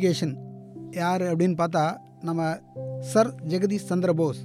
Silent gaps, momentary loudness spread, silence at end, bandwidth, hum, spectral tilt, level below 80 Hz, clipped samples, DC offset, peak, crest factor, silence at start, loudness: none; 13 LU; 0 s; 14.5 kHz; none; -6.5 dB/octave; -68 dBFS; under 0.1%; under 0.1%; -8 dBFS; 18 dB; 0 s; -26 LUFS